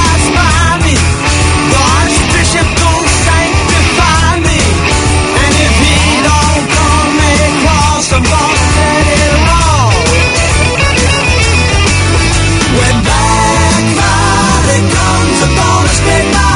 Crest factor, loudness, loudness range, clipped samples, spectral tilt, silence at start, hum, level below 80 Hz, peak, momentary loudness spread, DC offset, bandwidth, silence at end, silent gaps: 8 dB; -8 LUFS; 0 LU; 0.3%; -4 dB/octave; 0 s; none; -18 dBFS; 0 dBFS; 1 LU; under 0.1%; 11 kHz; 0 s; none